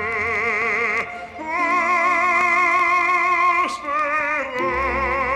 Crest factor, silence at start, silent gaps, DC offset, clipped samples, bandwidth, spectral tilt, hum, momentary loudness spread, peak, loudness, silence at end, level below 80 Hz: 12 dB; 0 s; none; under 0.1%; under 0.1%; 12 kHz; -4 dB/octave; none; 6 LU; -8 dBFS; -19 LUFS; 0 s; -44 dBFS